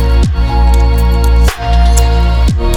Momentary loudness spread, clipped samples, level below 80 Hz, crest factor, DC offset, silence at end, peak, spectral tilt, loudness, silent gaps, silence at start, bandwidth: 2 LU; under 0.1%; -8 dBFS; 8 dB; under 0.1%; 0 s; 0 dBFS; -6 dB/octave; -11 LUFS; none; 0 s; 14.5 kHz